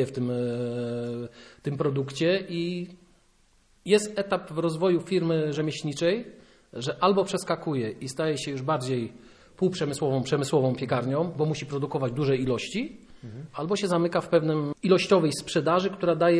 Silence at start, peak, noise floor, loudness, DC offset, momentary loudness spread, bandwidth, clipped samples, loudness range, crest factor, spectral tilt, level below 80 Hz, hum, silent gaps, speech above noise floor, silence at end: 0 s; -8 dBFS; -62 dBFS; -27 LUFS; under 0.1%; 11 LU; 11 kHz; under 0.1%; 3 LU; 18 dB; -6 dB/octave; -60 dBFS; none; none; 36 dB; 0 s